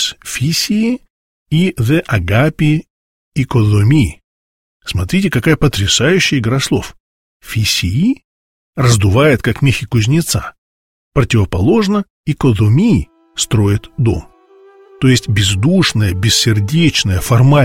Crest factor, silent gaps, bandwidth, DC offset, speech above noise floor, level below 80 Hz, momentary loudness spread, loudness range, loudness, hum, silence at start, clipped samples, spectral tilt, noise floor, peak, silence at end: 14 dB; 1.10-1.46 s, 2.90-3.31 s, 4.24-4.80 s, 7.00-7.40 s, 8.24-8.73 s, 10.58-11.12 s, 12.10-12.24 s; 16.5 kHz; 0.5%; 32 dB; -34 dBFS; 9 LU; 2 LU; -13 LUFS; none; 0 s; under 0.1%; -5 dB/octave; -44 dBFS; 0 dBFS; 0 s